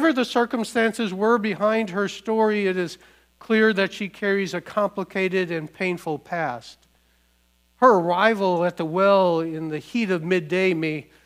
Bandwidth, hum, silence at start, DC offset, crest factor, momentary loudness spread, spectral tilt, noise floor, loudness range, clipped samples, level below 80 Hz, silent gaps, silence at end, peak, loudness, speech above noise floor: 15.5 kHz; none; 0 s; under 0.1%; 20 dB; 10 LU; -6 dB/octave; -63 dBFS; 5 LU; under 0.1%; -66 dBFS; none; 0.25 s; -2 dBFS; -22 LUFS; 41 dB